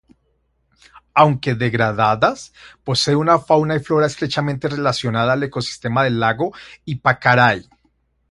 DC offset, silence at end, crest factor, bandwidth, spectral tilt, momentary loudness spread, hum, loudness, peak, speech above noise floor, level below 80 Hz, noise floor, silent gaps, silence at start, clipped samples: under 0.1%; 0.7 s; 18 dB; 11.5 kHz; -5.5 dB/octave; 9 LU; none; -17 LUFS; 0 dBFS; 47 dB; -52 dBFS; -65 dBFS; none; 1.15 s; under 0.1%